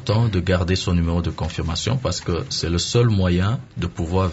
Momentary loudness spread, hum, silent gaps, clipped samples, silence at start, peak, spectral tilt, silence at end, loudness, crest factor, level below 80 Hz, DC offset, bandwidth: 8 LU; none; none; under 0.1%; 0 s; -4 dBFS; -5.5 dB/octave; 0 s; -21 LUFS; 16 dB; -30 dBFS; under 0.1%; 8 kHz